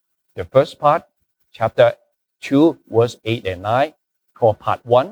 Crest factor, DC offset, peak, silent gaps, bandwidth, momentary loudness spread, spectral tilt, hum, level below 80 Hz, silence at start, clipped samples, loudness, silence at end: 18 dB; under 0.1%; -2 dBFS; none; over 20 kHz; 8 LU; -7 dB/octave; none; -56 dBFS; 0.35 s; under 0.1%; -18 LUFS; 0 s